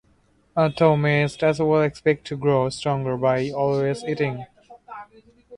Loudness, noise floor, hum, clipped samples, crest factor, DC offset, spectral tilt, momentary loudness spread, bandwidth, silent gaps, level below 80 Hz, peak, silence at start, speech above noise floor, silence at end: -22 LUFS; -61 dBFS; none; under 0.1%; 20 dB; under 0.1%; -7 dB/octave; 14 LU; 11 kHz; none; -56 dBFS; -4 dBFS; 0.55 s; 40 dB; 0 s